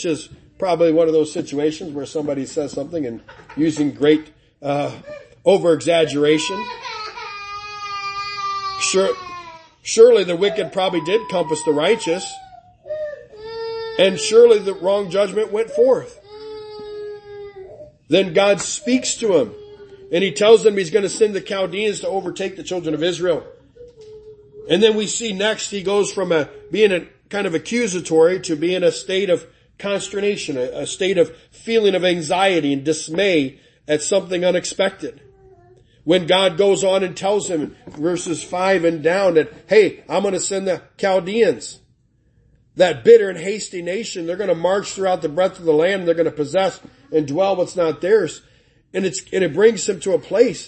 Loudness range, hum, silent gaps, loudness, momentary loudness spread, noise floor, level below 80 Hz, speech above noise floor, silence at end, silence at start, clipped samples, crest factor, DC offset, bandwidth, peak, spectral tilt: 4 LU; none; none; -18 LUFS; 14 LU; -59 dBFS; -58 dBFS; 41 dB; 0 s; 0 s; under 0.1%; 18 dB; under 0.1%; 8.8 kHz; 0 dBFS; -4 dB/octave